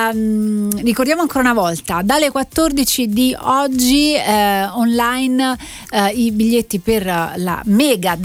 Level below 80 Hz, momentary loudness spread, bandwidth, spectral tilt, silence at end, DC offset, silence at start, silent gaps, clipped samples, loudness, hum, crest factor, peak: -40 dBFS; 5 LU; 16.5 kHz; -4 dB/octave; 0 s; under 0.1%; 0 s; none; under 0.1%; -15 LUFS; none; 16 dB; 0 dBFS